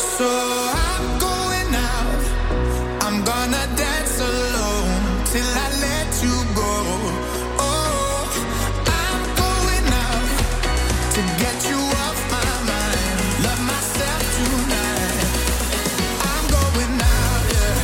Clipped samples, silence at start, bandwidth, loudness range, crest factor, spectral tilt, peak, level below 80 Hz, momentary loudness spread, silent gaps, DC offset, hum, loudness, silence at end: under 0.1%; 0 s; 16.5 kHz; 1 LU; 18 dB; -3.5 dB/octave; -2 dBFS; -24 dBFS; 3 LU; none; under 0.1%; none; -20 LUFS; 0 s